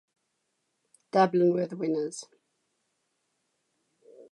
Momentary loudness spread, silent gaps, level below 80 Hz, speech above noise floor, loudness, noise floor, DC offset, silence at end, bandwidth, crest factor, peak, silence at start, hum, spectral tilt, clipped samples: 12 LU; none; -86 dBFS; 53 dB; -27 LUFS; -79 dBFS; under 0.1%; 0.1 s; 11 kHz; 22 dB; -10 dBFS; 1.15 s; none; -6.5 dB/octave; under 0.1%